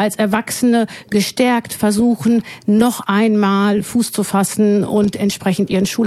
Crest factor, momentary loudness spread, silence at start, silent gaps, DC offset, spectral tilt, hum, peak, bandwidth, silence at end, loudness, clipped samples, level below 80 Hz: 14 dB; 4 LU; 0 s; none; under 0.1%; -5 dB/octave; none; 0 dBFS; 14.5 kHz; 0 s; -16 LUFS; under 0.1%; -52 dBFS